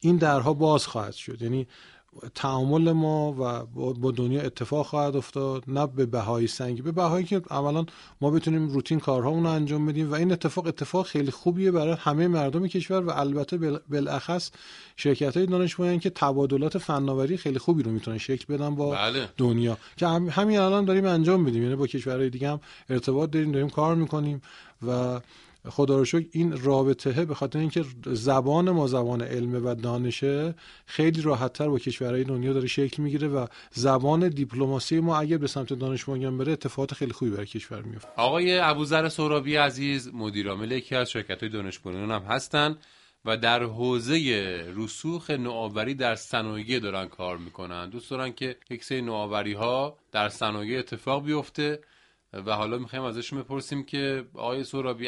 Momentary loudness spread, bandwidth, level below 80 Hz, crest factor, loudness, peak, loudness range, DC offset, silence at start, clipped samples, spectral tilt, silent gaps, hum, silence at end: 10 LU; 11.5 kHz; -62 dBFS; 20 dB; -27 LUFS; -6 dBFS; 5 LU; under 0.1%; 0 s; under 0.1%; -6.5 dB/octave; none; none; 0 s